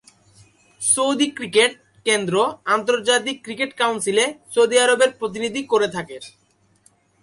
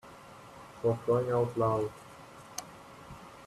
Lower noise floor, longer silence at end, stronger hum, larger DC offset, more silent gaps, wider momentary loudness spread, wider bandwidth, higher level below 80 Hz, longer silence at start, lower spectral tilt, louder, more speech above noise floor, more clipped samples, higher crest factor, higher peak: first, -59 dBFS vs -51 dBFS; first, 0.95 s vs 0 s; neither; neither; neither; second, 10 LU vs 22 LU; second, 11.5 kHz vs 13.5 kHz; about the same, -66 dBFS vs -64 dBFS; first, 0.8 s vs 0.05 s; second, -2 dB/octave vs -6.5 dB/octave; first, -19 LUFS vs -32 LUFS; first, 39 dB vs 22 dB; neither; about the same, 16 dB vs 18 dB; first, -4 dBFS vs -16 dBFS